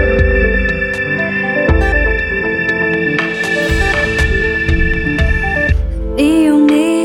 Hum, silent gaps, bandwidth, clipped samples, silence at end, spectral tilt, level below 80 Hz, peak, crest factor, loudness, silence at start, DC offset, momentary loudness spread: none; none; 14 kHz; under 0.1%; 0 s; -6.5 dB/octave; -18 dBFS; 0 dBFS; 12 dB; -13 LUFS; 0 s; under 0.1%; 5 LU